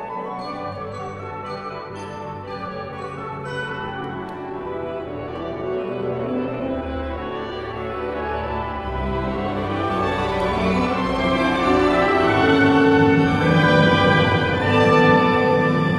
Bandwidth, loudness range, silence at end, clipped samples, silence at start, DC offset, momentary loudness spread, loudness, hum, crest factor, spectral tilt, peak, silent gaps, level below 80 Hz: 11.5 kHz; 14 LU; 0 s; under 0.1%; 0 s; under 0.1%; 16 LU; -20 LUFS; none; 18 dB; -7 dB/octave; -2 dBFS; none; -40 dBFS